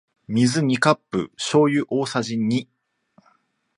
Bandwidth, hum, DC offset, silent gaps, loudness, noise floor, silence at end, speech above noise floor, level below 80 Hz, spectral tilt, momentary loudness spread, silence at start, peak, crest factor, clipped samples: 11.5 kHz; none; under 0.1%; none; -21 LUFS; -64 dBFS; 1.15 s; 43 dB; -62 dBFS; -5.5 dB/octave; 8 LU; 0.3 s; 0 dBFS; 22 dB; under 0.1%